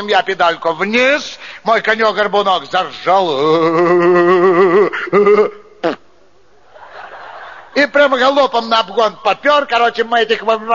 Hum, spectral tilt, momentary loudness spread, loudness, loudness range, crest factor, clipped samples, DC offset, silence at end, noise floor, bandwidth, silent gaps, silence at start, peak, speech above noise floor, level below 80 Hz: none; -2 dB/octave; 11 LU; -13 LUFS; 4 LU; 14 dB; under 0.1%; 0.5%; 0 s; -51 dBFS; 7.2 kHz; none; 0 s; 0 dBFS; 38 dB; -58 dBFS